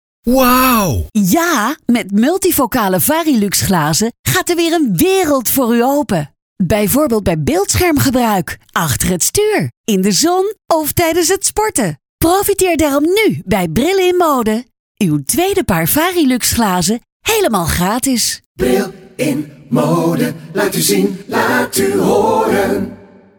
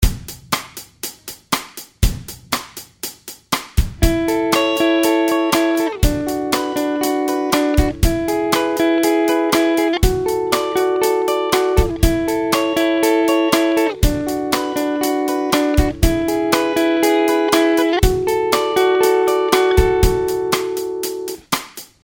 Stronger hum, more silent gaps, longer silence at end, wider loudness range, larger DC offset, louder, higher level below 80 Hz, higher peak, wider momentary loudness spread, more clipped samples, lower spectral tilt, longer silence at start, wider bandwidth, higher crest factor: neither; first, 4.19-4.24 s, 6.42-6.56 s, 9.77-9.84 s, 12.09-12.18 s, 14.79-14.95 s, 17.12-17.20 s, 18.46-18.55 s vs none; first, 0.45 s vs 0.2 s; about the same, 2 LU vs 4 LU; neither; first, -13 LUFS vs -17 LUFS; second, -36 dBFS vs -26 dBFS; about the same, 0 dBFS vs 0 dBFS; second, 6 LU vs 9 LU; neither; about the same, -4 dB/octave vs -5 dB/octave; first, 0.25 s vs 0 s; first, over 20 kHz vs 18 kHz; about the same, 14 dB vs 16 dB